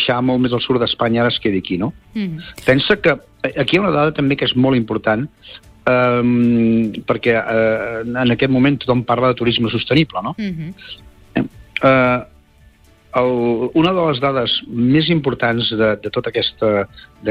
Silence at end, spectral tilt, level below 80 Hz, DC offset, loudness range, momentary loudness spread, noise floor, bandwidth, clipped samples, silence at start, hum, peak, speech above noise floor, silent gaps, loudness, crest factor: 0 s; -7.5 dB/octave; -46 dBFS; under 0.1%; 2 LU; 10 LU; -49 dBFS; 10 kHz; under 0.1%; 0 s; none; -2 dBFS; 32 dB; none; -17 LUFS; 14 dB